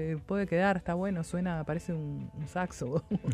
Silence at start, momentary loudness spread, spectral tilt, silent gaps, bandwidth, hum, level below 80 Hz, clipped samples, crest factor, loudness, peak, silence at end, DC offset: 0 s; 9 LU; -7 dB/octave; none; 12 kHz; none; -54 dBFS; under 0.1%; 16 dB; -33 LUFS; -16 dBFS; 0 s; under 0.1%